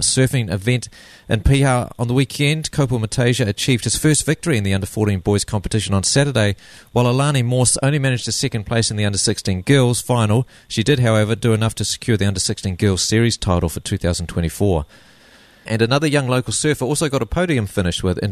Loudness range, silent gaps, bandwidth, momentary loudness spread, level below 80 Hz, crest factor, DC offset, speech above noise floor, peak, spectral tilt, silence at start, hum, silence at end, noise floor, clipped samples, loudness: 2 LU; none; 13.5 kHz; 6 LU; -36 dBFS; 16 dB; under 0.1%; 30 dB; -2 dBFS; -4.5 dB/octave; 0 s; none; 0 s; -48 dBFS; under 0.1%; -18 LUFS